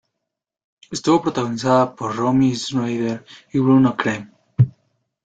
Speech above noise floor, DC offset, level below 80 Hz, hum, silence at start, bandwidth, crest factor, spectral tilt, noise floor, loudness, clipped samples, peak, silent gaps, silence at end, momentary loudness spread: 63 dB; under 0.1%; -56 dBFS; none; 0.9 s; 9 kHz; 16 dB; -6.5 dB/octave; -81 dBFS; -19 LUFS; under 0.1%; -2 dBFS; none; 0.55 s; 10 LU